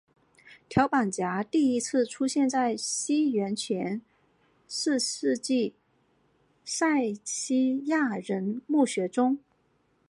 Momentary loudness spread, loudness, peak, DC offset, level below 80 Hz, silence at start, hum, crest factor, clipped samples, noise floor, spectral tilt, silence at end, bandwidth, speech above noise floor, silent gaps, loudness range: 6 LU; -27 LUFS; -8 dBFS; under 0.1%; -66 dBFS; 0.45 s; none; 20 dB; under 0.1%; -69 dBFS; -4 dB/octave; 0.7 s; 11.5 kHz; 42 dB; none; 3 LU